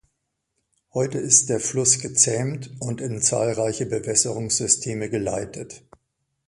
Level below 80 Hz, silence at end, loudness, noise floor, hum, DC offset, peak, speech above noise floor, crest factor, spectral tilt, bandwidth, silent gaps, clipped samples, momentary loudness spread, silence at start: -56 dBFS; 0.7 s; -21 LUFS; -77 dBFS; none; under 0.1%; -2 dBFS; 54 dB; 22 dB; -3 dB/octave; 11.5 kHz; none; under 0.1%; 14 LU; 0.95 s